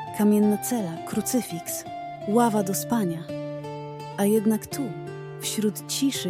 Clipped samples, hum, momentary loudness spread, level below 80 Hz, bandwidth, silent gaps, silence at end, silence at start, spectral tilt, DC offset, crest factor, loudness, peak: under 0.1%; none; 13 LU; -64 dBFS; 16.5 kHz; none; 0 s; 0 s; -5 dB/octave; under 0.1%; 18 dB; -26 LUFS; -8 dBFS